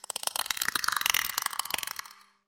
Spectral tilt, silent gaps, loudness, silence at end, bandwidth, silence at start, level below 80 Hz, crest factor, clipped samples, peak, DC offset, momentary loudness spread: 2 dB/octave; none; -29 LUFS; 0.35 s; 17 kHz; 0.1 s; -66 dBFS; 28 dB; under 0.1%; -4 dBFS; under 0.1%; 8 LU